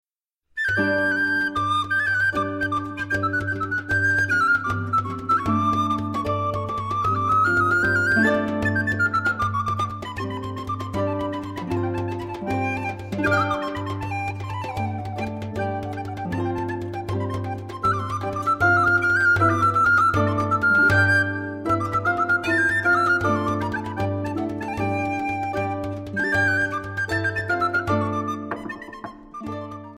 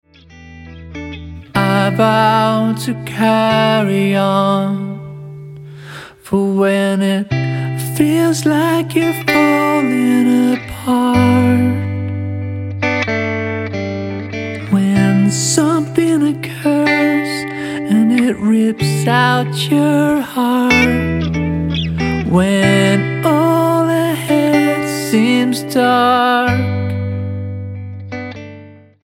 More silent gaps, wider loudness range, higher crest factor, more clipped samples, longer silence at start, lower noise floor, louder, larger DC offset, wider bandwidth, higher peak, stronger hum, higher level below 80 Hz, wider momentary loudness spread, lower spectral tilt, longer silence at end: neither; first, 8 LU vs 4 LU; about the same, 16 dB vs 14 dB; neither; first, 0.55 s vs 0.35 s; first, -69 dBFS vs -40 dBFS; second, -22 LUFS vs -14 LUFS; neither; second, 13.5 kHz vs 17 kHz; second, -6 dBFS vs 0 dBFS; neither; second, -48 dBFS vs -40 dBFS; about the same, 12 LU vs 14 LU; about the same, -6.5 dB/octave vs -5.5 dB/octave; second, 0 s vs 0.3 s